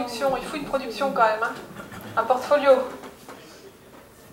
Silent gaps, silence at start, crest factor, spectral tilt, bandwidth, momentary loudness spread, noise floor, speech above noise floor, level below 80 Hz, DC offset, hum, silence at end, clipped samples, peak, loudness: none; 0 s; 18 dB; -4 dB/octave; 16.5 kHz; 22 LU; -48 dBFS; 25 dB; -58 dBFS; under 0.1%; none; 0.1 s; under 0.1%; -6 dBFS; -23 LUFS